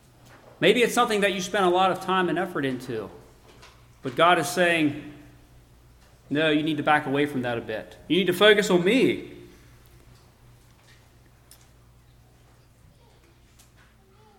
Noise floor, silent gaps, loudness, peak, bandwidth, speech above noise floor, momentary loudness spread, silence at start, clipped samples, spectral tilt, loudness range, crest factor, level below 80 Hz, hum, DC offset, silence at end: -56 dBFS; none; -23 LUFS; -4 dBFS; 17 kHz; 33 dB; 15 LU; 0.6 s; under 0.1%; -4.5 dB/octave; 4 LU; 22 dB; -58 dBFS; none; under 0.1%; 4.9 s